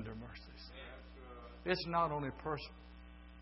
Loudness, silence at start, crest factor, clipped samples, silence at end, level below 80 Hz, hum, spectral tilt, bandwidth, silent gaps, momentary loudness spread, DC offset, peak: -40 LUFS; 0 s; 24 dB; under 0.1%; 0 s; -56 dBFS; none; -4 dB/octave; 5.8 kHz; none; 21 LU; under 0.1%; -18 dBFS